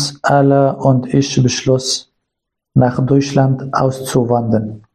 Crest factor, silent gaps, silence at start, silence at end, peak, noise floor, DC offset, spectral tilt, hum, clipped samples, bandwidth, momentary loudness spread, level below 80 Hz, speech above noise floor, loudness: 14 dB; none; 0 s; 0.15 s; 0 dBFS; -78 dBFS; under 0.1%; -6 dB/octave; none; under 0.1%; 14 kHz; 6 LU; -46 dBFS; 65 dB; -14 LUFS